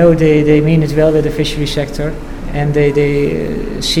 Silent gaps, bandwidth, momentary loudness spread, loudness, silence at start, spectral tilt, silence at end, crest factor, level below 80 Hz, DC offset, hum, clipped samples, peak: none; 15.5 kHz; 11 LU; -13 LUFS; 0 s; -6.5 dB/octave; 0 s; 12 dB; -26 dBFS; under 0.1%; none; under 0.1%; 0 dBFS